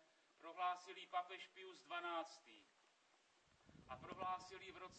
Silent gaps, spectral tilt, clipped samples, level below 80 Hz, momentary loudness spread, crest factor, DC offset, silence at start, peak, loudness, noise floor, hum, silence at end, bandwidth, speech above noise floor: none; -3 dB/octave; under 0.1%; -82 dBFS; 19 LU; 20 dB; under 0.1%; 0 s; -32 dBFS; -50 LUFS; -77 dBFS; none; 0 s; 8.4 kHz; 26 dB